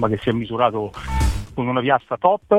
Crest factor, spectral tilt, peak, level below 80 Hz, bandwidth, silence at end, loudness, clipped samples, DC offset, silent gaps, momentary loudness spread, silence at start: 18 dB; -6.5 dB/octave; -2 dBFS; -30 dBFS; 15.5 kHz; 0 s; -21 LUFS; under 0.1%; under 0.1%; none; 7 LU; 0 s